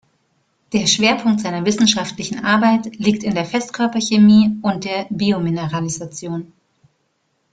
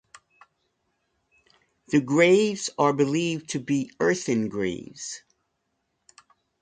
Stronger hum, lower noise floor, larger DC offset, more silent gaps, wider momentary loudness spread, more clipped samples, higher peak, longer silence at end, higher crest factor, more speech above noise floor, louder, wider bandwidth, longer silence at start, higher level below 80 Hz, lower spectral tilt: neither; second, -67 dBFS vs -76 dBFS; neither; neither; second, 12 LU vs 17 LU; neither; first, -2 dBFS vs -6 dBFS; second, 1.05 s vs 1.45 s; second, 16 dB vs 22 dB; about the same, 50 dB vs 53 dB; first, -17 LUFS vs -24 LUFS; about the same, 9.2 kHz vs 9.6 kHz; second, 0.7 s vs 1.9 s; first, -56 dBFS vs -66 dBFS; about the same, -4.5 dB/octave vs -5 dB/octave